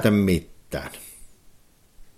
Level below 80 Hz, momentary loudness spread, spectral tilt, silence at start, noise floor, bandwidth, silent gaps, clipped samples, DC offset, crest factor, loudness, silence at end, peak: -46 dBFS; 23 LU; -6.5 dB/octave; 0 s; -54 dBFS; 16 kHz; none; under 0.1%; under 0.1%; 20 dB; -25 LUFS; 0.15 s; -6 dBFS